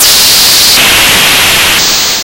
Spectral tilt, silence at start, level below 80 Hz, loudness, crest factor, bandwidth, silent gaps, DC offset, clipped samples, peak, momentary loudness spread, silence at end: 0.5 dB/octave; 0 s; -30 dBFS; -2 LUFS; 6 dB; over 20 kHz; none; under 0.1%; 2%; 0 dBFS; 3 LU; 0.05 s